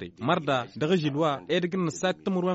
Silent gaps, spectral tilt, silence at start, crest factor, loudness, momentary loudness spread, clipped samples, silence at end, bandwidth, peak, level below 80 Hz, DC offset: none; -5 dB/octave; 0 s; 16 dB; -27 LUFS; 3 LU; under 0.1%; 0 s; 8 kHz; -12 dBFS; -66 dBFS; under 0.1%